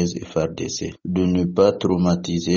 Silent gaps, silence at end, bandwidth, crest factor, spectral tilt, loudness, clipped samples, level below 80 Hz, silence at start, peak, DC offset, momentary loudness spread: none; 0 s; 7.4 kHz; 18 dB; -6 dB/octave; -21 LUFS; under 0.1%; -48 dBFS; 0 s; -4 dBFS; under 0.1%; 9 LU